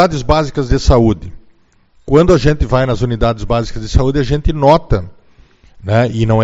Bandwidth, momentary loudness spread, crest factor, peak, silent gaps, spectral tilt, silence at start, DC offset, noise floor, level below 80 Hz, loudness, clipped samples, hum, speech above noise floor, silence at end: 8 kHz; 7 LU; 12 dB; 0 dBFS; none; -7 dB/octave; 0 s; under 0.1%; -50 dBFS; -22 dBFS; -13 LUFS; 0.3%; none; 38 dB; 0 s